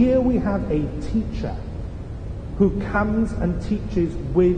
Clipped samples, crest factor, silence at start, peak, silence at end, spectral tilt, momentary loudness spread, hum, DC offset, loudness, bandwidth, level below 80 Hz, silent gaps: under 0.1%; 14 dB; 0 s; -6 dBFS; 0 s; -9 dB/octave; 13 LU; none; under 0.1%; -23 LUFS; 9.4 kHz; -32 dBFS; none